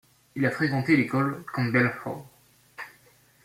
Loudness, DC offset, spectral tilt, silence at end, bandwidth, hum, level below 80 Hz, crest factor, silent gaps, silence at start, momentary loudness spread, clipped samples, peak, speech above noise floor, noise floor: -25 LUFS; under 0.1%; -7.5 dB/octave; 0.55 s; 16 kHz; none; -66 dBFS; 20 dB; none; 0.35 s; 20 LU; under 0.1%; -8 dBFS; 34 dB; -59 dBFS